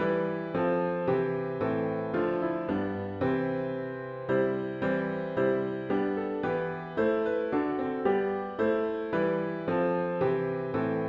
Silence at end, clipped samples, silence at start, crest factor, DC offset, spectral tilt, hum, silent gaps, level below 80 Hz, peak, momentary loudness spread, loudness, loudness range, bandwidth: 0 s; under 0.1%; 0 s; 14 dB; under 0.1%; -9.5 dB/octave; none; none; -62 dBFS; -14 dBFS; 4 LU; -30 LUFS; 1 LU; 5.4 kHz